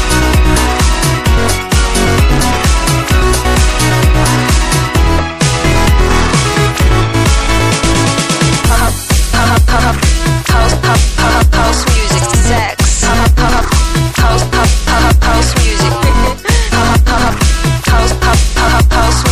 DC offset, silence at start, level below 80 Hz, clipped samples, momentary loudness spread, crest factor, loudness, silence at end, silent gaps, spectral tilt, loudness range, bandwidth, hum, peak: 3%; 0 s; -12 dBFS; under 0.1%; 2 LU; 10 dB; -10 LUFS; 0 s; none; -4 dB/octave; 0 LU; 15.5 kHz; none; 0 dBFS